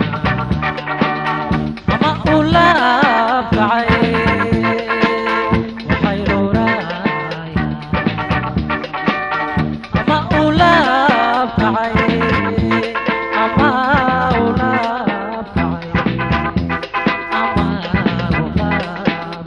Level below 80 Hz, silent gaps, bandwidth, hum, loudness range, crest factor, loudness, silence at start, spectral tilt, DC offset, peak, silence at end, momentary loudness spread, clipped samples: -32 dBFS; none; 10 kHz; none; 4 LU; 16 dB; -16 LUFS; 0 s; -7 dB/octave; under 0.1%; 0 dBFS; 0 s; 8 LU; under 0.1%